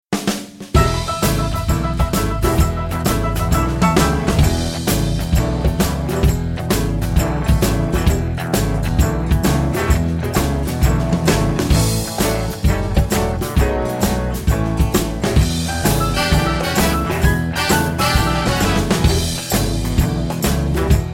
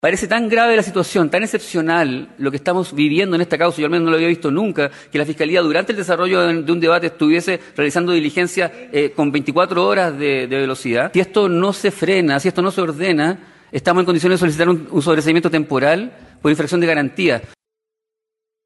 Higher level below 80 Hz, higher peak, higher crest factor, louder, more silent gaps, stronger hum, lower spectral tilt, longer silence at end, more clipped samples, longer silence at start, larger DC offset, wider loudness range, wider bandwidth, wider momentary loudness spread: first, -22 dBFS vs -58 dBFS; about the same, 0 dBFS vs -2 dBFS; about the same, 16 dB vs 14 dB; about the same, -18 LUFS vs -17 LUFS; neither; neither; about the same, -5 dB/octave vs -5.5 dB/octave; second, 0 s vs 1.2 s; neither; about the same, 0.1 s vs 0.05 s; neither; about the same, 2 LU vs 1 LU; first, 17 kHz vs 12 kHz; about the same, 3 LU vs 5 LU